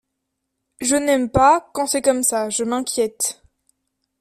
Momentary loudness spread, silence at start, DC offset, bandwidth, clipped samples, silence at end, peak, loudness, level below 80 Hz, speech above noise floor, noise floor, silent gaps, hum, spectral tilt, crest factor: 8 LU; 0.8 s; under 0.1%; 15.5 kHz; under 0.1%; 0.9 s; -2 dBFS; -19 LUFS; -46 dBFS; 59 dB; -77 dBFS; none; none; -3 dB/octave; 18 dB